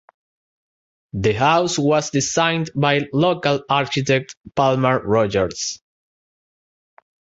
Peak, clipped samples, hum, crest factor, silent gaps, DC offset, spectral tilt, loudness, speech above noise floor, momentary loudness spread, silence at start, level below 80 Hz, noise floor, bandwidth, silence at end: -2 dBFS; under 0.1%; none; 18 dB; 4.37-4.41 s; under 0.1%; -4.5 dB/octave; -19 LUFS; over 71 dB; 7 LU; 1.15 s; -50 dBFS; under -90 dBFS; 8 kHz; 1.6 s